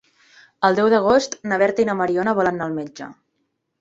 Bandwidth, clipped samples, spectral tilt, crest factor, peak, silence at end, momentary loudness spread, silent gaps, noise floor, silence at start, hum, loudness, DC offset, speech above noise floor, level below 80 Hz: 7.8 kHz; under 0.1%; -5 dB/octave; 18 dB; -2 dBFS; 0.7 s; 14 LU; none; -73 dBFS; 0.6 s; none; -19 LUFS; under 0.1%; 54 dB; -58 dBFS